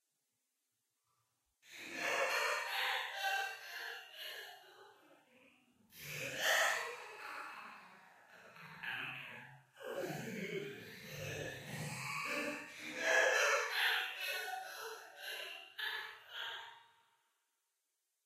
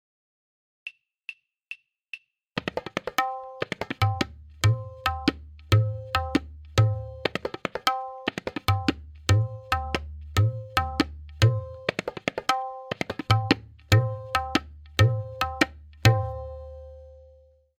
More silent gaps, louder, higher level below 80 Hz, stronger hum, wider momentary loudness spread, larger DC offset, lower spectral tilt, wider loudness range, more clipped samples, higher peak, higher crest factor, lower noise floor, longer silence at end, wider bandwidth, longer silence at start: neither; second, -39 LUFS vs -27 LUFS; second, -82 dBFS vs -46 dBFS; neither; about the same, 19 LU vs 19 LU; neither; second, -1.5 dB/octave vs -5.5 dB/octave; first, 11 LU vs 6 LU; neither; second, -20 dBFS vs 0 dBFS; about the same, 22 dB vs 26 dB; first, -86 dBFS vs -56 dBFS; first, 1.4 s vs 0.65 s; about the same, 15.5 kHz vs 16 kHz; first, 1.65 s vs 0.85 s